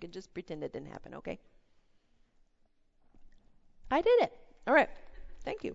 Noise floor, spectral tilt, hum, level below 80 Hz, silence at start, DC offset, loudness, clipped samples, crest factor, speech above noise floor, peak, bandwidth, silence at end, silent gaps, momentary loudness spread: -69 dBFS; -5.5 dB/octave; none; -56 dBFS; 0 s; under 0.1%; -31 LUFS; under 0.1%; 22 dB; 37 dB; -12 dBFS; 7.8 kHz; 0 s; none; 18 LU